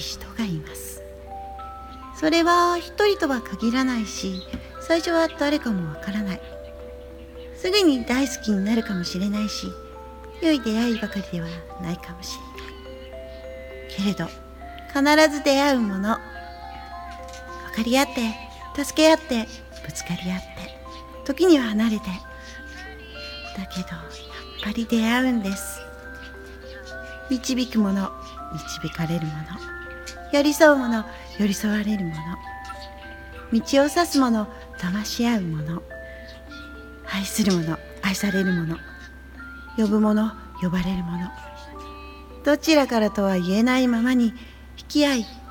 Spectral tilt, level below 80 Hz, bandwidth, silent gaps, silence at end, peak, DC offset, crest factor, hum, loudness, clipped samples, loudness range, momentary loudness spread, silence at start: -5 dB/octave; -44 dBFS; 18 kHz; none; 0 s; 0 dBFS; under 0.1%; 24 dB; none; -23 LUFS; under 0.1%; 5 LU; 20 LU; 0 s